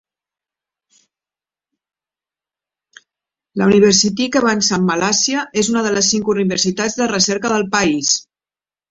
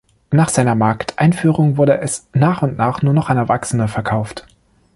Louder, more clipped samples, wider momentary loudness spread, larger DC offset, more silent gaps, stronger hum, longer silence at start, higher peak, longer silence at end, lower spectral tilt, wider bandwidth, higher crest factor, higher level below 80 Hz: about the same, -15 LUFS vs -16 LUFS; neither; about the same, 6 LU vs 6 LU; neither; neither; neither; first, 3.55 s vs 0.3 s; about the same, 0 dBFS vs -2 dBFS; first, 0.7 s vs 0.55 s; second, -3 dB/octave vs -6.5 dB/octave; second, 8 kHz vs 11.5 kHz; about the same, 18 dB vs 14 dB; second, -54 dBFS vs -46 dBFS